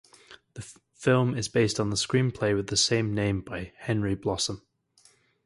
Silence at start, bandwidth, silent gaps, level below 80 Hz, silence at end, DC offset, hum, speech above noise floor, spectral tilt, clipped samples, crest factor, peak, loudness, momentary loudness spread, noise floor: 0.3 s; 11.5 kHz; none; -52 dBFS; 0.85 s; under 0.1%; none; 36 dB; -4.5 dB/octave; under 0.1%; 18 dB; -10 dBFS; -27 LUFS; 19 LU; -62 dBFS